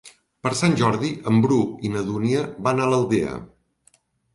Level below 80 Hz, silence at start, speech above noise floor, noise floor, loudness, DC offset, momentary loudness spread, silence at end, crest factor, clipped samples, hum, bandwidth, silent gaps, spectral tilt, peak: -54 dBFS; 0.05 s; 41 dB; -61 dBFS; -22 LUFS; under 0.1%; 8 LU; 0.9 s; 16 dB; under 0.1%; none; 11.5 kHz; none; -6 dB/octave; -6 dBFS